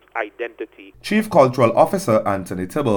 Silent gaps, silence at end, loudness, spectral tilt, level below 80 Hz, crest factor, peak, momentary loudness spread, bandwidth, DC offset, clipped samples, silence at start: none; 0 s; -18 LUFS; -6.5 dB/octave; -54 dBFS; 18 dB; 0 dBFS; 17 LU; over 20 kHz; under 0.1%; under 0.1%; 0.15 s